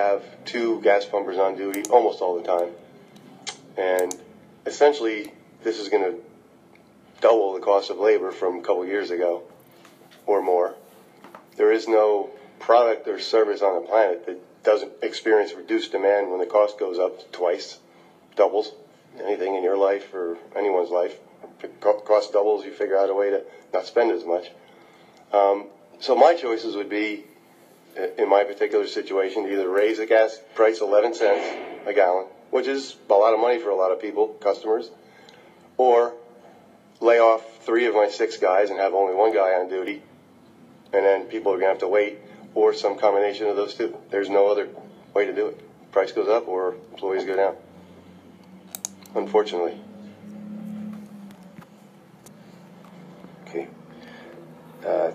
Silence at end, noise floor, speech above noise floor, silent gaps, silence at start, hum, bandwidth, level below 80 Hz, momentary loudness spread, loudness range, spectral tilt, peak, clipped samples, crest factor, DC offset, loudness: 0 s; -53 dBFS; 31 dB; none; 0 s; none; 15.5 kHz; -80 dBFS; 15 LU; 6 LU; -4 dB/octave; -2 dBFS; under 0.1%; 22 dB; under 0.1%; -22 LUFS